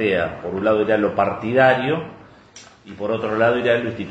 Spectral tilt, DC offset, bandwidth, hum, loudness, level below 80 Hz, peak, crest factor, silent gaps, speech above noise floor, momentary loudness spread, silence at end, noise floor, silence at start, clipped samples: -6.5 dB/octave; under 0.1%; 8.2 kHz; none; -19 LUFS; -54 dBFS; -2 dBFS; 18 dB; none; 26 dB; 10 LU; 0 s; -45 dBFS; 0 s; under 0.1%